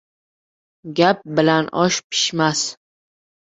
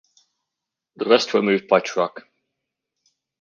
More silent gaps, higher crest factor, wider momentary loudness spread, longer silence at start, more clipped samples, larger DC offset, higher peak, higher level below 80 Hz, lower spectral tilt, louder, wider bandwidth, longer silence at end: first, 2.04-2.10 s vs none; about the same, 20 dB vs 22 dB; second, 6 LU vs 9 LU; second, 0.85 s vs 1 s; neither; neither; about the same, 0 dBFS vs -2 dBFS; first, -62 dBFS vs -74 dBFS; about the same, -3.5 dB/octave vs -4.5 dB/octave; about the same, -18 LUFS vs -20 LUFS; first, 8.2 kHz vs 7.2 kHz; second, 0.8 s vs 1.2 s